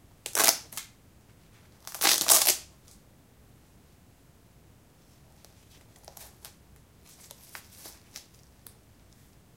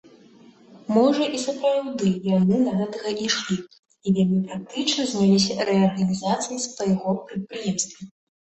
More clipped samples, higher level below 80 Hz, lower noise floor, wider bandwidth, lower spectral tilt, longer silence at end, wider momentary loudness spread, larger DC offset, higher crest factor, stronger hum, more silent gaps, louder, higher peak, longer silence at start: neither; about the same, -64 dBFS vs -62 dBFS; first, -58 dBFS vs -51 dBFS; first, 17 kHz vs 8.6 kHz; second, 1 dB/octave vs -5 dB/octave; first, 1.4 s vs 0.4 s; first, 29 LU vs 10 LU; neither; first, 34 dB vs 18 dB; neither; second, none vs 3.79-3.83 s; about the same, -22 LUFS vs -23 LUFS; first, 0 dBFS vs -6 dBFS; second, 0.25 s vs 0.7 s